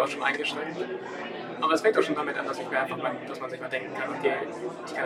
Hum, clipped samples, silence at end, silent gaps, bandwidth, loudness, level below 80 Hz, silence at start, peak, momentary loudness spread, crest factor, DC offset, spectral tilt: none; under 0.1%; 0 s; none; 14 kHz; -29 LUFS; -76 dBFS; 0 s; -8 dBFS; 12 LU; 22 dB; under 0.1%; -4 dB/octave